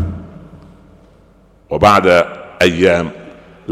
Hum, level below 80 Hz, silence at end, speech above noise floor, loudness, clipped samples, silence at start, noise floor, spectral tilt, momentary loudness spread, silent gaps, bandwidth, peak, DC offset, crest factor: none; -38 dBFS; 0 s; 36 dB; -13 LUFS; under 0.1%; 0 s; -47 dBFS; -5.5 dB/octave; 22 LU; none; 16 kHz; 0 dBFS; under 0.1%; 16 dB